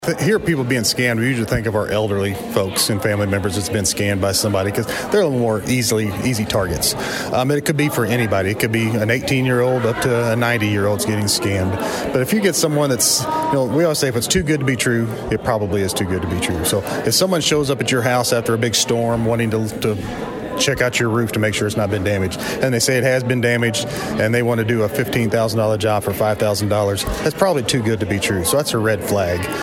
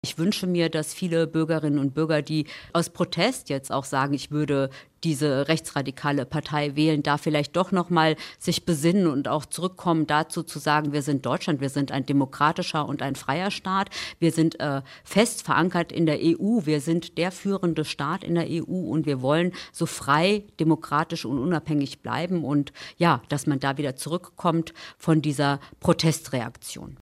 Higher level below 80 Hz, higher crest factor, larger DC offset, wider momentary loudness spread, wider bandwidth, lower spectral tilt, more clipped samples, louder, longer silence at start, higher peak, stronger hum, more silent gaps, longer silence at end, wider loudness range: first, -42 dBFS vs -60 dBFS; about the same, 16 dB vs 18 dB; neither; second, 4 LU vs 7 LU; about the same, 16.5 kHz vs 15.5 kHz; about the same, -4.5 dB/octave vs -5.5 dB/octave; neither; first, -18 LUFS vs -25 LUFS; about the same, 0 s vs 0.05 s; first, -2 dBFS vs -6 dBFS; neither; neither; about the same, 0 s vs 0.05 s; about the same, 1 LU vs 2 LU